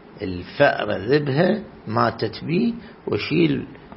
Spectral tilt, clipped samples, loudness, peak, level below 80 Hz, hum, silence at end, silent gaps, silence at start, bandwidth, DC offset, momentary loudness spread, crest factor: -11 dB/octave; under 0.1%; -22 LUFS; -2 dBFS; -52 dBFS; none; 0 s; none; 0.05 s; 5.8 kHz; under 0.1%; 10 LU; 20 dB